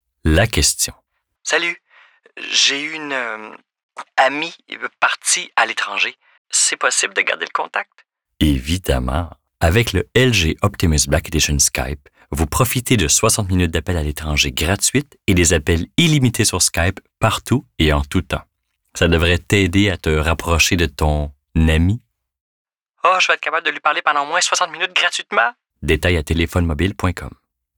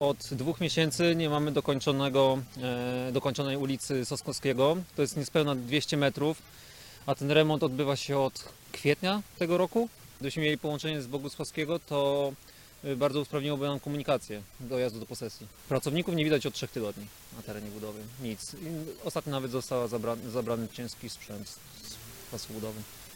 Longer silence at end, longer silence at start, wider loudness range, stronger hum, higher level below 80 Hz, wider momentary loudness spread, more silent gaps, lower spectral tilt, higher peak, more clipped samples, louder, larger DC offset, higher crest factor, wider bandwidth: first, 0.5 s vs 0 s; first, 0.25 s vs 0 s; second, 3 LU vs 7 LU; neither; first, -32 dBFS vs -60 dBFS; second, 10 LU vs 15 LU; first, 3.83-3.89 s, 6.38-6.45 s, 22.41-22.65 s vs none; second, -3.5 dB/octave vs -5 dB/octave; first, -2 dBFS vs -10 dBFS; neither; first, -17 LUFS vs -31 LUFS; neither; second, 16 dB vs 22 dB; first, over 20 kHz vs 17 kHz